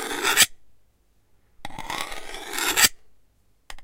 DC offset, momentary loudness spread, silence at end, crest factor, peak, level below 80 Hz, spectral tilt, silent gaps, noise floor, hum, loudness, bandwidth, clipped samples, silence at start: under 0.1%; 21 LU; 0 s; 24 dB; -4 dBFS; -48 dBFS; 0.5 dB/octave; none; -63 dBFS; none; -21 LUFS; 17 kHz; under 0.1%; 0 s